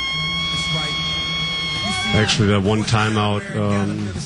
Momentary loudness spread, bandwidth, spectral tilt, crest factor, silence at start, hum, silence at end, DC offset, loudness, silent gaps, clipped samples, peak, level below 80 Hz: 5 LU; 10.5 kHz; -4.5 dB/octave; 14 dB; 0 s; none; 0 s; under 0.1%; -19 LUFS; none; under 0.1%; -6 dBFS; -40 dBFS